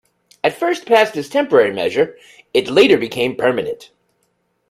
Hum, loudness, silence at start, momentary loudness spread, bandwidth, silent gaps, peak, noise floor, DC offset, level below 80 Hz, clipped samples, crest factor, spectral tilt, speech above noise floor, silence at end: none; -16 LUFS; 0.45 s; 9 LU; 15 kHz; none; 0 dBFS; -66 dBFS; under 0.1%; -60 dBFS; under 0.1%; 18 dB; -4.5 dB/octave; 50 dB; 0.85 s